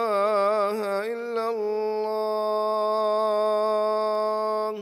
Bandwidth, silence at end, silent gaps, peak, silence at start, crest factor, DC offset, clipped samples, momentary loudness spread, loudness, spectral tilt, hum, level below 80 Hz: 15 kHz; 0 s; none; -12 dBFS; 0 s; 12 dB; under 0.1%; under 0.1%; 5 LU; -25 LUFS; -4.5 dB/octave; none; under -90 dBFS